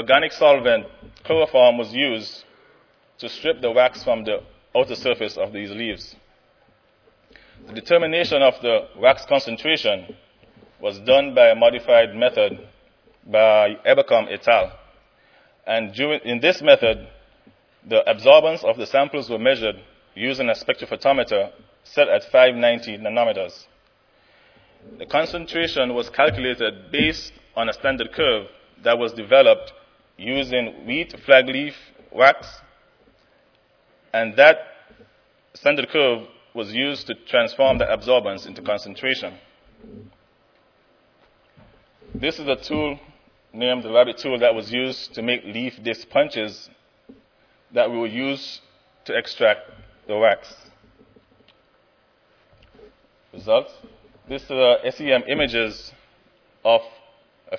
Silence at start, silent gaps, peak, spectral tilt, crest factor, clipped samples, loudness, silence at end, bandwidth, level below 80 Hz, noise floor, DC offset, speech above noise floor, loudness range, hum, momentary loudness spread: 0 s; none; 0 dBFS; -5 dB/octave; 22 dB; under 0.1%; -19 LUFS; 0 s; 5.4 kHz; -54 dBFS; -61 dBFS; under 0.1%; 41 dB; 9 LU; none; 15 LU